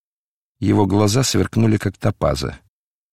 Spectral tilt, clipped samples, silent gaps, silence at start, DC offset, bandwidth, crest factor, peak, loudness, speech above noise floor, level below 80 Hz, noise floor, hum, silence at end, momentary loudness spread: -5.5 dB/octave; under 0.1%; none; 0.6 s; under 0.1%; 15.5 kHz; 16 dB; -4 dBFS; -18 LUFS; over 73 dB; -40 dBFS; under -90 dBFS; none; 0.55 s; 9 LU